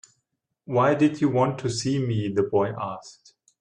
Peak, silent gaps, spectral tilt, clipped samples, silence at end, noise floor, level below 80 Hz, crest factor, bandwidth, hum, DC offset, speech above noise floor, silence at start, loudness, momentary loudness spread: -10 dBFS; none; -6.5 dB/octave; under 0.1%; 0.5 s; -78 dBFS; -62 dBFS; 16 dB; 10 kHz; none; under 0.1%; 55 dB; 0.7 s; -24 LUFS; 10 LU